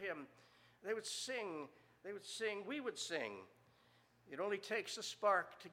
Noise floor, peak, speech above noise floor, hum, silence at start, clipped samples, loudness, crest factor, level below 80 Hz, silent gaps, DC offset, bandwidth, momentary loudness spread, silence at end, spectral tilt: -72 dBFS; -24 dBFS; 28 dB; none; 0 s; under 0.1%; -43 LUFS; 22 dB; -90 dBFS; none; under 0.1%; 16 kHz; 16 LU; 0 s; -2 dB/octave